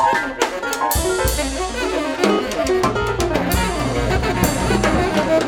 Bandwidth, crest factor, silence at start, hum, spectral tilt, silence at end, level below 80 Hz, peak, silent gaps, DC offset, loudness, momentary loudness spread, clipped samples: over 20 kHz; 18 dB; 0 s; none; -4.5 dB/octave; 0 s; -28 dBFS; -2 dBFS; none; under 0.1%; -19 LUFS; 4 LU; under 0.1%